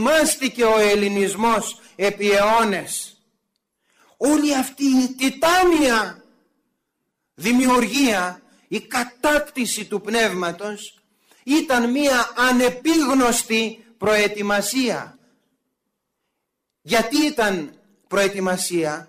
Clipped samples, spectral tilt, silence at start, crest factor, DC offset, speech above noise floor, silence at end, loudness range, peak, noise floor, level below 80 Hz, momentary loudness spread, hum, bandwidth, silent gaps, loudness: under 0.1%; -3 dB/octave; 0 s; 12 dB; under 0.1%; 59 dB; 0.05 s; 5 LU; -8 dBFS; -78 dBFS; -52 dBFS; 12 LU; none; 16 kHz; none; -19 LUFS